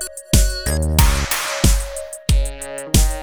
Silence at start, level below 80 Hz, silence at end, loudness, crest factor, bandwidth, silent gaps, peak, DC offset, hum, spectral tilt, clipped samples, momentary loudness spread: 0 s; -20 dBFS; 0 s; -19 LUFS; 18 dB; over 20 kHz; none; 0 dBFS; under 0.1%; none; -4 dB/octave; under 0.1%; 10 LU